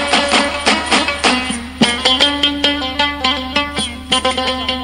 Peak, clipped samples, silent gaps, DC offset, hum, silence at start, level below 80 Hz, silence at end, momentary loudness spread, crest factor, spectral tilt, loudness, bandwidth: 0 dBFS; under 0.1%; none; under 0.1%; none; 0 s; -36 dBFS; 0 s; 6 LU; 16 dB; -2.5 dB/octave; -14 LUFS; 16.5 kHz